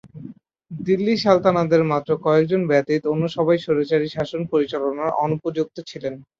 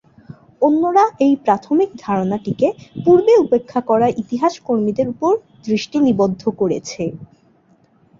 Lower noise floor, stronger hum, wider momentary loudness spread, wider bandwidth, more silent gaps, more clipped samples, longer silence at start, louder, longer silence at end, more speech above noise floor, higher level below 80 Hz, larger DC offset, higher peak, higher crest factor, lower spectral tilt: second, -41 dBFS vs -55 dBFS; neither; first, 13 LU vs 8 LU; about the same, 7.4 kHz vs 7.6 kHz; neither; neither; second, 0.05 s vs 0.3 s; second, -21 LUFS vs -17 LUFS; second, 0.2 s vs 0.95 s; second, 21 dB vs 39 dB; about the same, -60 dBFS vs -56 dBFS; neither; about the same, -4 dBFS vs -2 dBFS; about the same, 18 dB vs 16 dB; about the same, -7.5 dB/octave vs -7 dB/octave